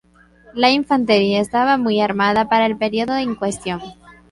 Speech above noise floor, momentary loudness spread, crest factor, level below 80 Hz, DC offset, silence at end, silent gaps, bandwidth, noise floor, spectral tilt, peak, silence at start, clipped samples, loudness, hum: 32 dB; 11 LU; 16 dB; -52 dBFS; under 0.1%; 0.2 s; none; 11.5 kHz; -49 dBFS; -5 dB/octave; -2 dBFS; 0.55 s; under 0.1%; -17 LUFS; none